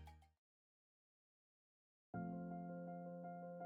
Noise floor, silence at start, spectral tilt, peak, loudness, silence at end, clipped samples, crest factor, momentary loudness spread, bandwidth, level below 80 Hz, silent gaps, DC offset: under -90 dBFS; 0 s; -9.5 dB/octave; -38 dBFS; -51 LUFS; 0 s; under 0.1%; 16 dB; 5 LU; 4.8 kHz; -76 dBFS; 0.38-2.13 s; under 0.1%